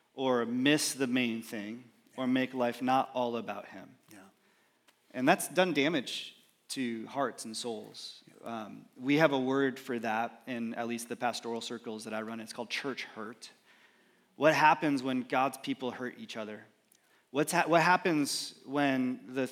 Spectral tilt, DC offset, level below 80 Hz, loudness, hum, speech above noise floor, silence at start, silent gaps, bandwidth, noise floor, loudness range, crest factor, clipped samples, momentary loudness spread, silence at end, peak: -4 dB/octave; under 0.1%; under -90 dBFS; -31 LUFS; none; 38 dB; 0.15 s; none; 16.5 kHz; -69 dBFS; 6 LU; 24 dB; under 0.1%; 17 LU; 0 s; -8 dBFS